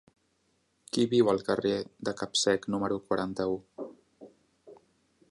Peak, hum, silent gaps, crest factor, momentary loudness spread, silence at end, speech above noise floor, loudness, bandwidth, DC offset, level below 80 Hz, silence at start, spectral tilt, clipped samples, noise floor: -12 dBFS; none; none; 20 dB; 12 LU; 0.55 s; 44 dB; -29 LUFS; 11.5 kHz; under 0.1%; -66 dBFS; 0.95 s; -4.5 dB/octave; under 0.1%; -73 dBFS